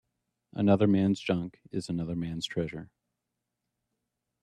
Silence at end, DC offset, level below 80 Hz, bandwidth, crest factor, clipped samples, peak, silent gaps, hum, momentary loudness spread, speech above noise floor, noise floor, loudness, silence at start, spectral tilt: 1.55 s; under 0.1%; -62 dBFS; 10.5 kHz; 20 dB; under 0.1%; -10 dBFS; none; none; 14 LU; 57 dB; -85 dBFS; -29 LUFS; 0.55 s; -7 dB/octave